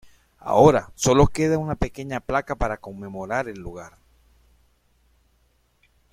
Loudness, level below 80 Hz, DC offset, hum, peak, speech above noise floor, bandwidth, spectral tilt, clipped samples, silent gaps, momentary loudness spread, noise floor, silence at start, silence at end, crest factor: -22 LUFS; -38 dBFS; under 0.1%; none; -2 dBFS; 43 dB; 15 kHz; -5.5 dB/octave; under 0.1%; none; 20 LU; -64 dBFS; 0.45 s; 2.25 s; 22 dB